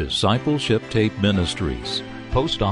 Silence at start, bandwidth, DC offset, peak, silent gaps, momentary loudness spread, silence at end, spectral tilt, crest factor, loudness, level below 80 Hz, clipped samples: 0 s; 11 kHz; under 0.1%; -6 dBFS; none; 6 LU; 0 s; -5.5 dB/octave; 16 dB; -22 LUFS; -36 dBFS; under 0.1%